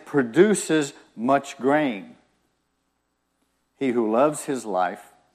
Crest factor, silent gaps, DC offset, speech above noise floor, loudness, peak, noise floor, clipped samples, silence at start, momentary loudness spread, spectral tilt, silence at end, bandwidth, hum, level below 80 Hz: 20 dB; none; under 0.1%; 51 dB; -23 LUFS; -4 dBFS; -73 dBFS; under 0.1%; 0.05 s; 11 LU; -5 dB/octave; 0.3 s; 14.5 kHz; 60 Hz at -70 dBFS; -74 dBFS